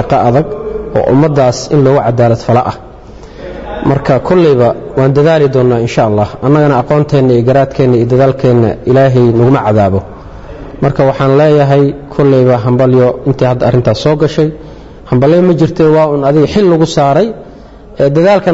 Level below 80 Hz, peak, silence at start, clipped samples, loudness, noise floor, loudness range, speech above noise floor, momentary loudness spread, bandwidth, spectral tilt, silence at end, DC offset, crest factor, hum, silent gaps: -34 dBFS; 0 dBFS; 0 s; under 0.1%; -9 LUFS; -32 dBFS; 2 LU; 24 dB; 8 LU; 8 kHz; -8 dB/octave; 0 s; under 0.1%; 8 dB; none; none